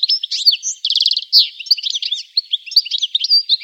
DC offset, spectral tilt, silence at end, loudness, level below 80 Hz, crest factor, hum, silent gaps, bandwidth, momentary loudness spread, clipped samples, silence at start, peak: under 0.1%; 13.5 dB/octave; 0 s; -14 LUFS; under -90 dBFS; 16 dB; none; none; 16 kHz; 7 LU; under 0.1%; 0 s; 0 dBFS